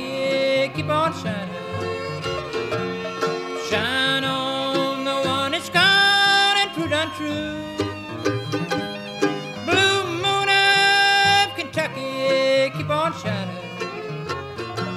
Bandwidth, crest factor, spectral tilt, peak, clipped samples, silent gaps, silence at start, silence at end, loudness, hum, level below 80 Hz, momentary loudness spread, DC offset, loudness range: 15.5 kHz; 16 dB; -3.5 dB/octave; -6 dBFS; under 0.1%; none; 0 s; 0 s; -21 LUFS; none; -56 dBFS; 14 LU; under 0.1%; 6 LU